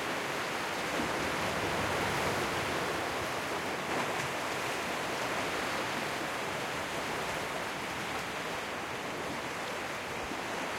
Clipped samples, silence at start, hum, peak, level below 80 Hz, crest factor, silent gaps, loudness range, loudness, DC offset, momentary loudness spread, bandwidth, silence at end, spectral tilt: under 0.1%; 0 s; none; -18 dBFS; -60 dBFS; 16 dB; none; 3 LU; -34 LUFS; under 0.1%; 5 LU; 16.5 kHz; 0 s; -3 dB/octave